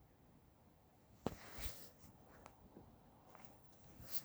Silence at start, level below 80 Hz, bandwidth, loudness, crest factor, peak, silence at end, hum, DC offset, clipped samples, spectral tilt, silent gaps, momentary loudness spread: 0 s; -64 dBFS; over 20 kHz; -53 LUFS; 32 dB; -22 dBFS; 0 s; none; under 0.1%; under 0.1%; -4 dB/octave; none; 21 LU